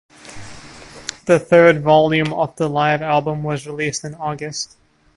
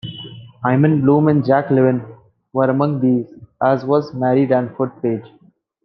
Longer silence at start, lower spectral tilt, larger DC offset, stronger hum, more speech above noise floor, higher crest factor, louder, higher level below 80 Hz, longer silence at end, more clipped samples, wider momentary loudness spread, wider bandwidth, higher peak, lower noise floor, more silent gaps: first, 0.25 s vs 0.05 s; second, -5 dB/octave vs -10.5 dB/octave; neither; neither; about the same, 22 dB vs 20 dB; about the same, 18 dB vs 16 dB; about the same, -17 LUFS vs -17 LUFS; first, -50 dBFS vs -60 dBFS; about the same, 0.5 s vs 0.6 s; neither; first, 25 LU vs 12 LU; first, 11.5 kHz vs 5.8 kHz; about the same, 0 dBFS vs -2 dBFS; about the same, -39 dBFS vs -36 dBFS; neither